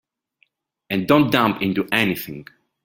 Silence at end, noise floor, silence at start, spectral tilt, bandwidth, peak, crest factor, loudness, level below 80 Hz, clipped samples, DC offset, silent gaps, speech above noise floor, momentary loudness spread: 0.4 s; -65 dBFS; 0.9 s; -6 dB/octave; 17 kHz; -2 dBFS; 20 dB; -19 LUFS; -56 dBFS; under 0.1%; under 0.1%; none; 46 dB; 14 LU